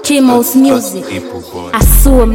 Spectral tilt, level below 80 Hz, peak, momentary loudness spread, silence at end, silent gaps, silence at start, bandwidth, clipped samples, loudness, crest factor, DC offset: -5 dB/octave; -14 dBFS; 0 dBFS; 14 LU; 0 s; none; 0 s; 17.5 kHz; 0.4%; -10 LUFS; 8 dB; under 0.1%